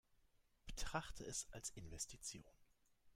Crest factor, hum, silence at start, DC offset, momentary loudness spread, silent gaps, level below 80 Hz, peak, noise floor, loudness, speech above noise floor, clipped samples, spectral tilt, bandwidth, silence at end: 24 dB; none; 0.25 s; under 0.1%; 9 LU; none; -60 dBFS; -28 dBFS; -77 dBFS; -50 LUFS; 27 dB; under 0.1%; -2.5 dB/octave; 16 kHz; 0 s